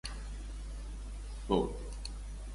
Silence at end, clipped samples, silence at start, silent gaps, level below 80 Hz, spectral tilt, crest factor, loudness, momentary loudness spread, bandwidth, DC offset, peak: 0 s; under 0.1%; 0.05 s; none; -42 dBFS; -6 dB/octave; 22 dB; -39 LUFS; 13 LU; 11.5 kHz; under 0.1%; -16 dBFS